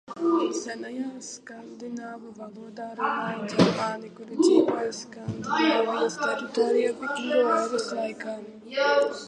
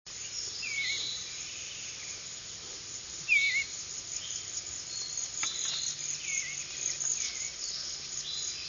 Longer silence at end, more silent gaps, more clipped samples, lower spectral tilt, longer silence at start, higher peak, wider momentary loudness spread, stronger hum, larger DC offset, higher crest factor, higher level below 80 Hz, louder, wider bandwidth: about the same, 0 s vs 0 s; neither; neither; first, -5 dB/octave vs 1.5 dB/octave; about the same, 0.1 s vs 0.05 s; first, -6 dBFS vs -16 dBFS; first, 17 LU vs 10 LU; neither; neither; about the same, 22 dB vs 20 dB; about the same, -68 dBFS vs -66 dBFS; first, -26 LUFS vs -33 LUFS; first, 11 kHz vs 7.6 kHz